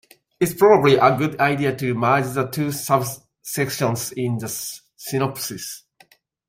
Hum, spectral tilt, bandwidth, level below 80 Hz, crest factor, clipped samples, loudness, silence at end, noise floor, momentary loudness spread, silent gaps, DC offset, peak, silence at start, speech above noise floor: none; -5 dB/octave; 16 kHz; -58 dBFS; 20 dB; under 0.1%; -20 LUFS; 0.7 s; -56 dBFS; 16 LU; none; under 0.1%; -2 dBFS; 0.4 s; 36 dB